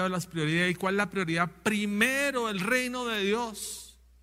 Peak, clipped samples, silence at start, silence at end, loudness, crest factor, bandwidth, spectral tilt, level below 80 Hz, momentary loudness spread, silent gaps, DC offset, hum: -8 dBFS; under 0.1%; 0 s; 0.3 s; -28 LUFS; 20 dB; 16 kHz; -4 dB/octave; -60 dBFS; 7 LU; none; under 0.1%; none